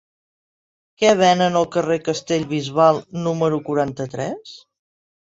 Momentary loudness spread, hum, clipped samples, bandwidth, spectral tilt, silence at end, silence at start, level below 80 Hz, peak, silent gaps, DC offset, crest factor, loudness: 12 LU; none; under 0.1%; 8 kHz; -5 dB/octave; 0.75 s; 1 s; -60 dBFS; -2 dBFS; none; under 0.1%; 18 dB; -19 LUFS